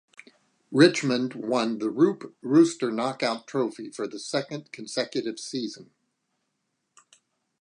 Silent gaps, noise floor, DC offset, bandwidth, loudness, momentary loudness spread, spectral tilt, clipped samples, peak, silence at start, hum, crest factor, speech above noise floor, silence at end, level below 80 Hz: none; -78 dBFS; under 0.1%; 10.5 kHz; -26 LUFS; 15 LU; -5 dB/octave; under 0.1%; -4 dBFS; 0.7 s; none; 24 dB; 53 dB; 1.8 s; -80 dBFS